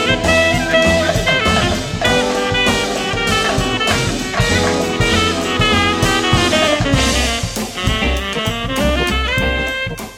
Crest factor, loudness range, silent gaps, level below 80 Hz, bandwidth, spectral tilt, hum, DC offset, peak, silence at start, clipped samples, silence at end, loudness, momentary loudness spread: 16 dB; 2 LU; none; -26 dBFS; 16.5 kHz; -4 dB/octave; none; under 0.1%; 0 dBFS; 0 s; under 0.1%; 0 s; -15 LUFS; 5 LU